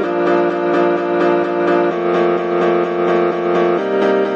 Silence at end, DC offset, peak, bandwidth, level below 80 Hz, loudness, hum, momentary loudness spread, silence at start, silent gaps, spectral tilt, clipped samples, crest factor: 0 s; under 0.1%; -4 dBFS; 7 kHz; -66 dBFS; -15 LUFS; none; 1 LU; 0 s; none; -7.5 dB/octave; under 0.1%; 12 dB